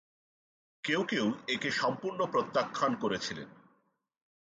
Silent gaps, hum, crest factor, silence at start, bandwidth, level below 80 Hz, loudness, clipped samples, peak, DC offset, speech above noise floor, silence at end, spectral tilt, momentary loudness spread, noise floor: none; none; 18 dB; 0.85 s; 9.4 kHz; -74 dBFS; -32 LUFS; under 0.1%; -16 dBFS; under 0.1%; 43 dB; 1.05 s; -4 dB/octave; 9 LU; -75 dBFS